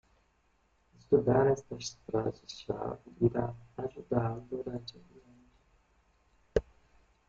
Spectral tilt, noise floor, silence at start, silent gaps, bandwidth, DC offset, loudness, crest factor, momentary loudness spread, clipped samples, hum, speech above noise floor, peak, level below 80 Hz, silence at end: -7 dB/octave; -71 dBFS; 1.1 s; none; 7.6 kHz; under 0.1%; -33 LUFS; 22 dB; 14 LU; under 0.1%; none; 39 dB; -12 dBFS; -56 dBFS; 0.65 s